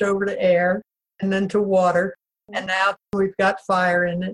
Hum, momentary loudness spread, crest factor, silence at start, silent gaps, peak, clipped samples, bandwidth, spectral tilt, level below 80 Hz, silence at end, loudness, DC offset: none; 10 LU; 14 dB; 0 s; none; -6 dBFS; under 0.1%; 11 kHz; -6 dB/octave; -58 dBFS; 0 s; -21 LUFS; under 0.1%